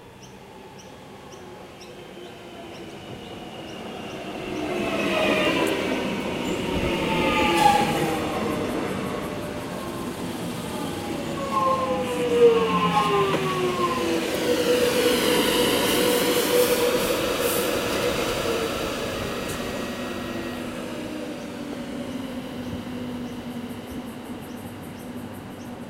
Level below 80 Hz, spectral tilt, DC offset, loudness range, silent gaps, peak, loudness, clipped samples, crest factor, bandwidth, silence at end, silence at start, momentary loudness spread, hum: -48 dBFS; -4 dB/octave; under 0.1%; 13 LU; none; -6 dBFS; -24 LUFS; under 0.1%; 20 dB; 16 kHz; 0 s; 0 s; 18 LU; none